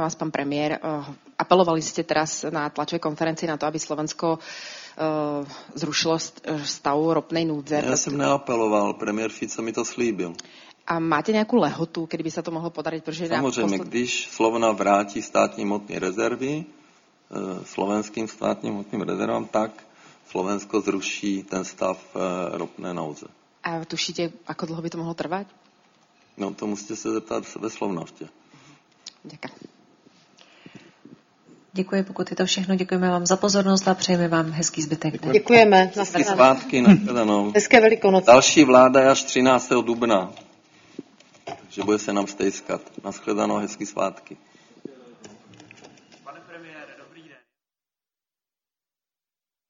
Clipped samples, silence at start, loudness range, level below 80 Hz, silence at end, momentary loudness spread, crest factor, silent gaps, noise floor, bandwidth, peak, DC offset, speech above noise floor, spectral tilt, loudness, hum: under 0.1%; 0 s; 15 LU; -64 dBFS; 2.65 s; 17 LU; 24 dB; none; under -90 dBFS; 7.6 kHz; 0 dBFS; under 0.1%; over 68 dB; -4.5 dB/octave; -22 LUFS; none